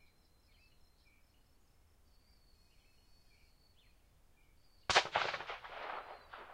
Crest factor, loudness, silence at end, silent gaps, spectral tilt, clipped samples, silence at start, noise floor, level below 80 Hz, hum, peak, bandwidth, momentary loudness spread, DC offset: 32 dB; -37 LUFS; 0 s; none; -1 dB/octave; under 0.1%; 4.9 s; -68 dBFS; -68 dBFS; none; -14 dBFS; 16 kHz; 18 LU; under 0.1%